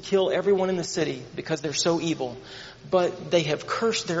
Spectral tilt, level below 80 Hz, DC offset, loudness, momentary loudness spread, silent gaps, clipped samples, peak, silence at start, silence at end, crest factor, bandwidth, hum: -4 dB/octave; -62 dBFS; under 0.1%; -25 LUFS; 11 LU; none; under 0.1%; -8 dBFS; 0 s; 0 s; 18 dB; 8 kHz; none